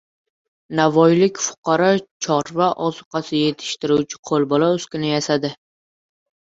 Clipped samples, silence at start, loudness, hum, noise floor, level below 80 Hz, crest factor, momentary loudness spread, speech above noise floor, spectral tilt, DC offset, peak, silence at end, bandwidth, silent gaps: under 0.1%; 0.7 s; -19 LUFS; none; under -90 dBFS; -62 dBFS; 18 dB; 9 LU; over 71 dB; -5 dB/octave; under 0.1%; -2 dBFS; 1.05 s; 8 kHz; 1.58-1.63 s, 2.11-2.20 s, 3.06-3.11 s, 4.19-4.23 s